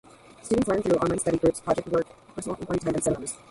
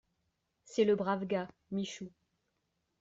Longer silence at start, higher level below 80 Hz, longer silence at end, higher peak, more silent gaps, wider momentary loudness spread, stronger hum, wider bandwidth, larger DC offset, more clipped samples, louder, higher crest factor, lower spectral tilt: second, 0.45 s vs 0.7 s; first, -50 dBFS vs -76 dBFS; second, 0.15 s vs 0.95 s; first, -10 dBFS vs -18 dBFS; neither; second, 11 LU vs 14 LU; neither; first, 11.5 kHz vs 7.8 kHz; neither; neither; first, -26 LUFS vs -34 LUFS; about the same, 16 dB vs 18 dB; about the same, -5.5 dB/octave vs -6 dB/octave